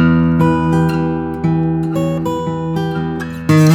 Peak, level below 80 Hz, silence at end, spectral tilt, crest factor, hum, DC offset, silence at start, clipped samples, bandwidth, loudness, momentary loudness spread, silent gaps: -2 dBFS; -40 dBFS; 0 s; -7.5 dB/octave; 12 dB; none; under 0.1%; 0 s; under 0.1%; 14.5 kHz; -16 LUFS; 7 LU; none